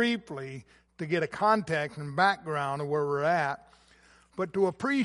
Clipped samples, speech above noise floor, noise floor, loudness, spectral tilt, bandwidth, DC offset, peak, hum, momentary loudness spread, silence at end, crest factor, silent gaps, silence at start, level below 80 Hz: under 0.1%; 31 dB; -60 dBFS; -29 LUFS; -6 dB/octave; 11.5 kHz; under 0.1%; -10 dBFS; none; 15 LU; 0 s; 18 dB; none; 0 s; -68 dBFS